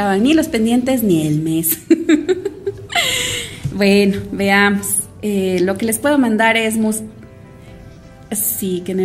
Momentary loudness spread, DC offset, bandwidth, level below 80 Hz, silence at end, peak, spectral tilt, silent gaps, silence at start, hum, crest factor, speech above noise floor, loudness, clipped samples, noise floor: 8 LU; under 0.1%; 16 kHz; -44 dBFS; 0 s; 0 dBFS; -4 dB/octave; none; 0 s; none; 16 dB; 23 dB; -16 LUFS; under 0.1%; -38 dBFS